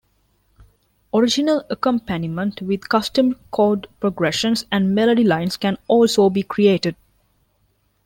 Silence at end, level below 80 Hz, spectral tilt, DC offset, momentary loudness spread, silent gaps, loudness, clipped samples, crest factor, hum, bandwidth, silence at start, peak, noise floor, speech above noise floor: 1.1 s; -54 dBFS; -5.5 dB/octave; under 0.1%; 7 LU; none; -19 LUFS; under 0.1%; 16 dB; none; 16.5 kHz; 1.15 s; -4 dBFS; -64 dBFS; 46 dB